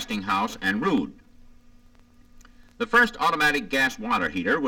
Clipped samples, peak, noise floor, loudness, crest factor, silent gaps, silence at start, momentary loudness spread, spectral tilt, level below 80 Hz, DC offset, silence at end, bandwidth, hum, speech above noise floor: under 0.1%; -8 dBFS; -53 dBFS; -23 LUFS; 18 dB; none; 0 s; 6 LU; -4 dB/octave; -52 dBFS; under 0.1%; 0 s; 19 kHz; none; 29 dB